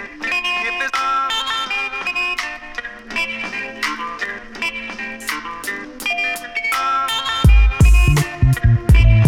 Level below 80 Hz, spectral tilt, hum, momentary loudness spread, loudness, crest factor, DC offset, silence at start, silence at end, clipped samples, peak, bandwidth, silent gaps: -20 dBFS; -4.5 dB/octave; none; 12 LU; -18 LUFS; 16 dB; under 0.1%; 0 s; 0 s; under 0.1%; -2 dBFS; 15.5 kHz; none